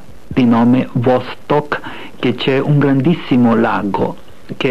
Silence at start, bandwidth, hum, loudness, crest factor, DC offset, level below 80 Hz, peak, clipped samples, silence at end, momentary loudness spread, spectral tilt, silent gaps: 0.3 s; 7.6 kHz; none; -15 LUFS; 12 dB; 3%; -46 dBFS; -2 dBFS; under 0.1%; 0 s; 11 LU; -8.5 dB/octave; none